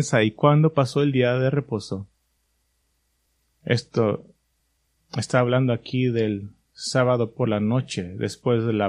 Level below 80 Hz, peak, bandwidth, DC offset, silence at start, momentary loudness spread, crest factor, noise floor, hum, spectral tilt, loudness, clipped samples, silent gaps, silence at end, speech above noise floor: -60 dBFS; -4 dBFS; 11 kHz; under 0.1%; 0 s; 13 LU; 20 dB; -70 dBFS; none; -6.5 dB/octave; -23 LUFS; under 0.1%; none; 0 s; 48 dB